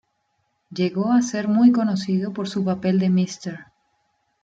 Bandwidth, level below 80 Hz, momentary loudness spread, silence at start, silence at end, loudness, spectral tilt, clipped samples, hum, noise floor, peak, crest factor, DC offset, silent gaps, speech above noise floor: 7.8 kHz; -66 dBFS; 15 LU; 0.7 s; 0.8 s; -21 LUFS; -6.5 dB/octave; under 0.1%; none; -71 dBFS; -6 dBFS; 16 dB; under 0.1%; none; 51 dB